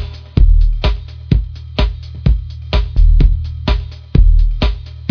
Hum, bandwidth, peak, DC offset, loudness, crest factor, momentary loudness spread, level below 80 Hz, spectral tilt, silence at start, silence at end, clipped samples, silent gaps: none; 5.4 kHz; 0 dBFS; under 0.1%; -17 LUFS; 12 dB; 8 LU; -12 dBFS; -8 dB/octave; 0 s; 0 s; under 0.1%; none